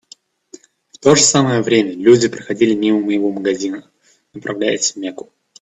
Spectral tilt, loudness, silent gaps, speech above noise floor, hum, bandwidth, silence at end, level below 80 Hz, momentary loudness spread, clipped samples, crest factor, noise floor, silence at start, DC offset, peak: -4 dB/octave; -15 LUFS; none; 32 dB; none; 9.2 kHz; 0.4 s; -58 dBFS; 17 LU; under 0.1%; 16 dB; -47 dBFS; 1.05 s; under 0.1%; 0 dBFS